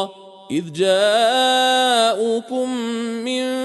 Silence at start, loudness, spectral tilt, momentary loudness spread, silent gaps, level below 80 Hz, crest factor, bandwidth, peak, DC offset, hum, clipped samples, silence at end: 0 s; -18 LUFS; -3 dB/octave; 10 LU; none; -74 dBFS; 14 dB; 12 kHz; -4 dBFS; under 0.1%; none; under 0.1%; 0 s